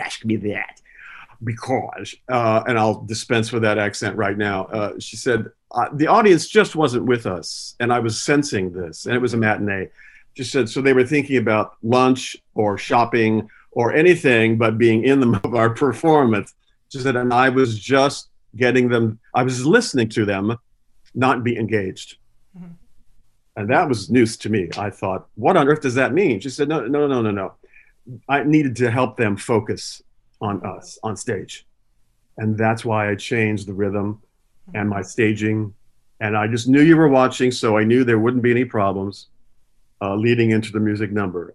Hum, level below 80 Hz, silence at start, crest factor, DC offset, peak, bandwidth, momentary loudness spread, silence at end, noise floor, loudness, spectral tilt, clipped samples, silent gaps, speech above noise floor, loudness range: none; -58 dBFS; 0 s; 18 dB; under 0.1%; 0 dBFS; 12 kHz; 13 LU; 0.05 s; -59 dBFS; -19 LUFS; -6 dB/octave; under 0.1%; none; 40 dB; 7 LU